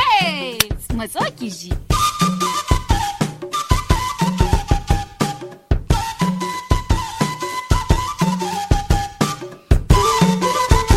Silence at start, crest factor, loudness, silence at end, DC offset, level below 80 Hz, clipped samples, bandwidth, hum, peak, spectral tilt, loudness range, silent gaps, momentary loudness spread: 0 s; 18 dB; -19 LUFS; 0 s; under 0.1%; -24 dBFS; under 0.1%; 16.5 kHz; none; 0 dBFS; -5 dB/octave; 3 LU; none; 8 LU